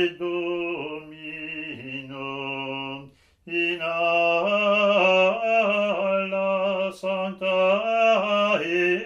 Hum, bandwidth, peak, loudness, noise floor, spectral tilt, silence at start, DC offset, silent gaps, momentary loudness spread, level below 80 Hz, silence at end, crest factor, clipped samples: none; 8.8 kHz; -8 dBFS; -23 LUFS; -47 dBFS; -5 dB/octave; 0 s; under 0.1%; none; 14 LU; -66 dBFS; 0 s; 16 dB; under 0.1%